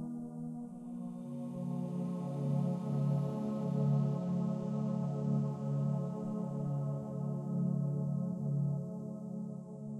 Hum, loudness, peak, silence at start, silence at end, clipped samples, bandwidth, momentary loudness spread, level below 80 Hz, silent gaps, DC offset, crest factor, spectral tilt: none; -37 LUFS; -22 dBFS; 0 s; 0 s; under 0.1%; 7.6 kHz; 9 LU; -74 dBFS; none; under 0.1%; 14 dB; -10.5 dB/octave